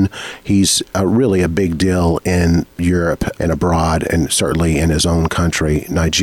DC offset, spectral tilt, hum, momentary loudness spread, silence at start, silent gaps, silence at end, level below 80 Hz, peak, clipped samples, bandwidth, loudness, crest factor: under 0.1%; -5 dB/octave; none; 4 LU; 0 s; none; 0 s; -28 dBFS; -4 dBFS; under 0.1%; 17 kHz; -15 LUFS; 10 dB